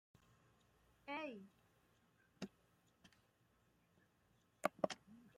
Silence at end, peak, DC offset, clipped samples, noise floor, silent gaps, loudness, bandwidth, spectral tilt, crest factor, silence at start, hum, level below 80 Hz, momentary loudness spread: 0.1 s; -20 dBFS; under 0.1%; under 0.1%; -78 dBFS; none; -48 LUFS; 16 kHz; -4.5 dB/octave; 32 dB; 1.05 s; none; -86 dBFS; 17 LU